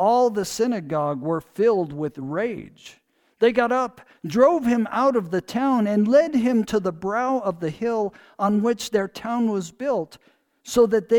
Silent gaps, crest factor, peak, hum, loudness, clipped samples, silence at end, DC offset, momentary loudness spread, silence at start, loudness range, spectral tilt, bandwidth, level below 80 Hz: none; 18 dB; -4 dBFS; none; -22 LUFS; under 0.1%; 0 s; under 0.1%; 10 LU; 0 s; 4 LU; -6 dB/octave; 18.5 kHz; -58 dBFS